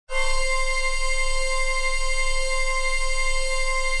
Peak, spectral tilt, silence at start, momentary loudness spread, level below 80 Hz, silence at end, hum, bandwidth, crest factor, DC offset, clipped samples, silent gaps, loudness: -10 dBFS; 0 dB/octave; 0.1 s; 1 LU; -24 dBFS; 0 s; none; 11 kHz; 10 dB; under 0.1%; under 0.1%; none; -24 LUFS